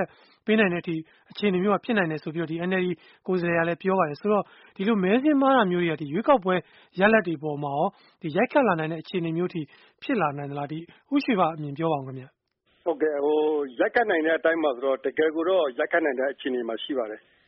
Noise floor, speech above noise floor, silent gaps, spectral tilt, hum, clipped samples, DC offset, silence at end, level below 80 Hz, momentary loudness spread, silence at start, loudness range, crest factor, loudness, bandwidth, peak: -66 dBFS; 41 dB; none; -4.5 dB/octave; none; under 0.1%; under 0.1%; 0.3 s; -68 dBFS; 12 LU; 0 s; 5 LU; 18 dB; -25 LUFS; 5.8 kHz; -6 dBFS